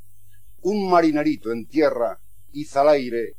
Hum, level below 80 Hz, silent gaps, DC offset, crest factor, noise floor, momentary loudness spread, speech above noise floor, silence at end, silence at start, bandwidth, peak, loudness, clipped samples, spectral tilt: none; -58 dBFS; none; 1%; 16 dB; -54 dBFS; 11 LU; 34 dB; 0.1 s; 0.65 s; 16 kHz; -6 dBFS; -21 LUFS; under 0.1%; -6.5 dB/octave